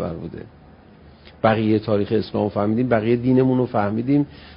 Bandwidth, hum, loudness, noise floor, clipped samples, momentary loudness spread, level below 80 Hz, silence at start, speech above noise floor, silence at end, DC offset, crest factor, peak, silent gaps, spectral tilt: 5.4 kHz; none; -20 LUFS; -47 dBFS; under 0.1%; 9 LU; -48 dBFS; 0 s; 27 dB; 0 s; under 0.1%; 18 dB; -2 dBFS; none; -12.5 dB/octave